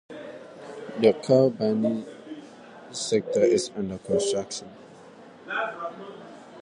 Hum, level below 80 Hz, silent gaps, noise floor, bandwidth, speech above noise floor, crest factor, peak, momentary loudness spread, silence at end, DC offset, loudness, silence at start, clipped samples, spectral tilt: none; -64 dBFS; none; -48 dBFS; 11 kHz; 23 dB; 20 dB; -6 dBFS; 22 LU; 0 s; under 0.1%; -25 LUFS; 0.1 s; under 0.1%; -5 dB/octave